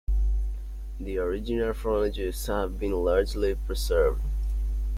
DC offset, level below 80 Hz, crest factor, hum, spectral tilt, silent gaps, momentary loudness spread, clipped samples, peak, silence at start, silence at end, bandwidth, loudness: under 0.1%; -30 dBFS; 16 dB; none; -6 dB/octave; none; 8 LU; under 0.1%; -10 dBFS; 0.1 s; 0 s; 15 kHz; -28 LUFS